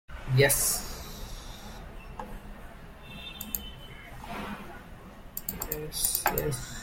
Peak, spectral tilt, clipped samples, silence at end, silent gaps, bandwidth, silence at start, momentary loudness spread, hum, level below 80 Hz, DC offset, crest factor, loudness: -6 dBFS; -3 dB/octave; under 0.1%; 0 s; none; 17 kHz; 0.1 s; 22 LU; none; -44 dBFS; under 0.1%; 26 dB; -29 LUFS